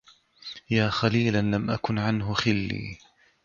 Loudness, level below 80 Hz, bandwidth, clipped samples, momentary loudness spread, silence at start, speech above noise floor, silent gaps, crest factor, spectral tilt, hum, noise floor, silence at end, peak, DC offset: -26 LUFS; -50 dBFS; 7.2 kHz; under 0.1%; 17 LU; 0.45 s; 21 dB; none; 20 dB; -6 dB/octave; none; -46 dBFS; 0.5 s; -8 dBFS; under 0.1%